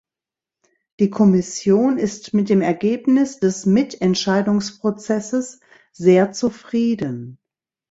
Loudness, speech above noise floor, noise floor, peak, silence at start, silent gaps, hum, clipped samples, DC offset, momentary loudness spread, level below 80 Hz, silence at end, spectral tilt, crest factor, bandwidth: -19 LUFS; 71 dB; -89 dBFS; -2 dBFS; 1 s; none; none; under 0.1%; under 0.1%; 9 LU; -58 dBFS; 0.55 s; -6 dB/octave; 16 dB; 8 kHz